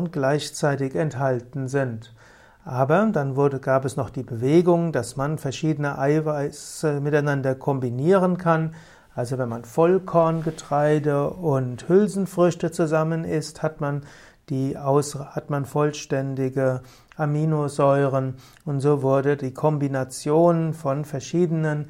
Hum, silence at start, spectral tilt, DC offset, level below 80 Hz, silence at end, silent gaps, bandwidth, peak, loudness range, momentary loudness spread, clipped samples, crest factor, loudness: none; 0 s; -7 dB/octave; under 0.1%; -56 dBFS; 0 s; none; 15.5 kHz; -6 dBFS; 3 LU; 9 LU; under 0.1%; 16 dB; -23 LUFS